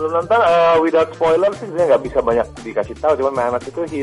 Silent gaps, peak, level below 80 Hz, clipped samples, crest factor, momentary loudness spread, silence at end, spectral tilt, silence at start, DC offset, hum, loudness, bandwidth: none; -4 dBFS; -44 dBFS; under 0.1%; 12 dB; 10 LU; 0 s; -6 dB/octave; 0 s; under 0.1%; none; -17 LUFS; 11.5 kHz